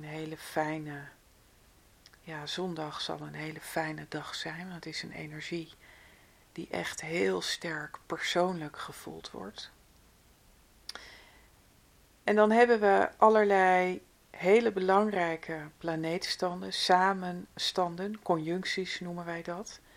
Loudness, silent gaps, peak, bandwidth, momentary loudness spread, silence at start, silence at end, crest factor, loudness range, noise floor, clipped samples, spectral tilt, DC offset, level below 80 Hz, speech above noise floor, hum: -30 LUFS; none; -8 dBFS; 16.5 kHz; 19 LU; 0 s; 0.2 s; 24 dB; 13 LU; -62 dBFS; under 0.1%; -4.5 dB/octave; under 0.1%; -66 dBFS; 32 dB; none